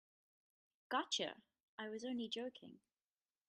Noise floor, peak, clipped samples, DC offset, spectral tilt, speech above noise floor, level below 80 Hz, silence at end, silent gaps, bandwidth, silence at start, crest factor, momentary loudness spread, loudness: under -90 dBFS; -26 dBFS; under 0.1%; under 0.1%; -2 dB/octave; over 45 dB; under -90 dBFS; 0.7 s; 1.63-1.78 s; 11.5 kHz; 0.9 s; 22 dB; 20 LU; -44 LUFS